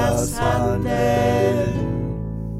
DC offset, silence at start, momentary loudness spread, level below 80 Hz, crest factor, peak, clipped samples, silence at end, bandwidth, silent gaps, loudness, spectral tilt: under 0.1%; 0 s; 8 LU; -34 dBFS; 14 dB; -6 dBFS; under 0.1%; 0 s; 16 kHz; none; -21 LUFS; -6 dB/octave